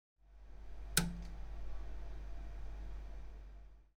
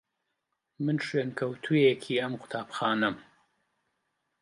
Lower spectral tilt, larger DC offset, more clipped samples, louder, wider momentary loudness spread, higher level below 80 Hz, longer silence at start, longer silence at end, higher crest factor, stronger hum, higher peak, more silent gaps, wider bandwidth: second, -3 dB/octave vs -6.5 dB/octave; neither; neither; second, -44 LUFS vs -29 LUFS; first, 22 LU vs 11 LU; first, -48 dBFS vs -76 dBFS; second, 0.25 s vs 0.8 s; second, 0.15 s vs 1.2 s; first, 28 dB vs 20 dB; neither; second, -14 dBFS vs -10 dBFS; neither; first, 15.5 kHz vs 11.5 kHz